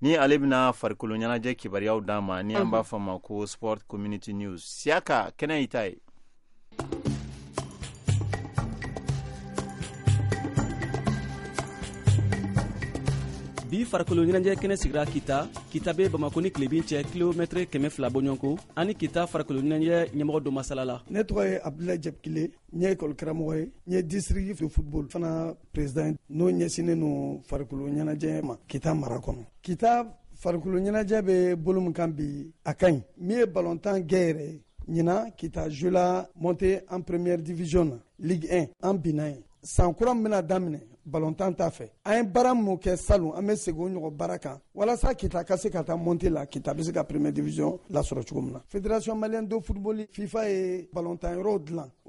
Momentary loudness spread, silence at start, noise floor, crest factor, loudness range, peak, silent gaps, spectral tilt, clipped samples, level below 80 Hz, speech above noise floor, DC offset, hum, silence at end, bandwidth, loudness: 10 LU; 0 s; -53 dBFS; 18 dB; 4 LU; -8 dBFS; none; -6.5 dB/octave; under 0.1%; -42 dBFS; 25 dB; under 0.1%; none; 0.2 s; 11.5 kHz; -28 LUFS